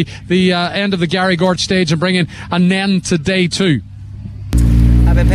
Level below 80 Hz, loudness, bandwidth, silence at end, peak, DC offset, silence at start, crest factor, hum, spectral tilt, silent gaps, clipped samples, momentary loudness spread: -20 dBFS; -14 LUFS; 13 kHz; 0 s; -4 dBFS; under 0.1%; 0 s; 10 dB; none; -5.5 dB/octave; none; under 0.1%; 8 LU